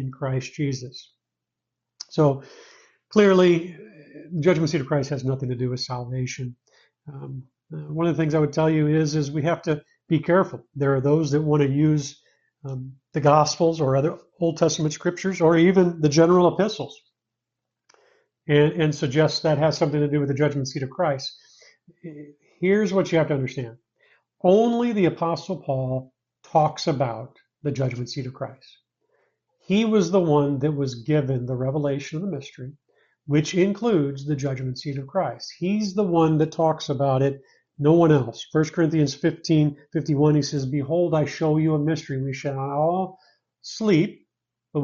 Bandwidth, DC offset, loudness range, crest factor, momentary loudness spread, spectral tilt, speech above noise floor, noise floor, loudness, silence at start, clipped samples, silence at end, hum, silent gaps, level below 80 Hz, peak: 7.4 kHz; under 0.1%; 5 LU; 18 dB; 15 LU; -6.5 dB/octave; 63 dB; -85 dBFS; -22 LUFS; 0 s; under 0.1%; 0 s; none; none; -62 dBFS; -4 dBFS